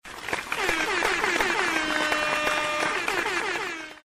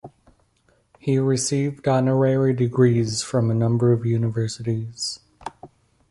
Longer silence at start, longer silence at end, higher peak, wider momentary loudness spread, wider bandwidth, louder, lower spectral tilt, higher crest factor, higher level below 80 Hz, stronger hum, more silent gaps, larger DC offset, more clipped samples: about the same, 0.05 s vs 0.05 s; second, 0.05 s vs 0.45 s; second, -10 dBFS vs -4 dBFS; second, 6 LU vs 11 LU; first, 15.5 kHz vs 11.5 kHz; second, -25 LUFS vs -21 LUFS; second, -1.5 dB/octave vs -6 dB/octave; about the same, 16 dB vs 18 dB; about the same, -52 dBFS vs -54 dBFS; neither; neither; neither; neither